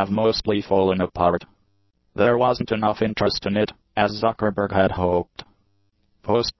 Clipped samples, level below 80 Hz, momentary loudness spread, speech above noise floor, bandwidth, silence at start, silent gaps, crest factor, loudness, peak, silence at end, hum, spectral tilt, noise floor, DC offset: under 0.1%; -44 dBFS; 6 LU; 46 dB; 6.2 kHz; 0 s; none; 18 dB; -21 LUFS; -4 dBFS; 0.1 s; none; -6.5 dB/octave; -66 dBFS; under 0.1%